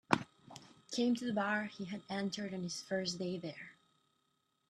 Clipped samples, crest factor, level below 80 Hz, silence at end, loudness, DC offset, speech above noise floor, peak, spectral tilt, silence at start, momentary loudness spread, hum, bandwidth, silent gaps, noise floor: under 0.1%; 32 dB; -78 dBFS; 1 s; -38 LUFS; under 0.1%; 42 dB; -8 dBFS; -4.5 dB/octave; 0.1 s; 19 LU; none; 13 kHz; none; -80 dBFS